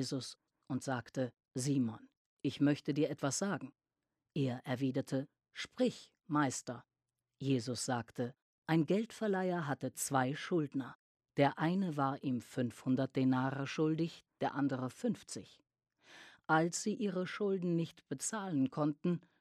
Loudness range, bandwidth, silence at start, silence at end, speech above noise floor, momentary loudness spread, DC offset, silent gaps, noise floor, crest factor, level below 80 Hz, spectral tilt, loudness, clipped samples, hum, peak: 3 LU; 14.5 kHz; 0 s; 0.2 s; over 54 dB; 11 LU; under 0.1%; 2.17-2.37 s, 8.42-8.62 s, 10.95-11.15 s; under -90 dBFS; 22 dB; -80 dBFS; -5.5 dB/octave; -37 LUFS; under 0.1%; none; -16 dBFS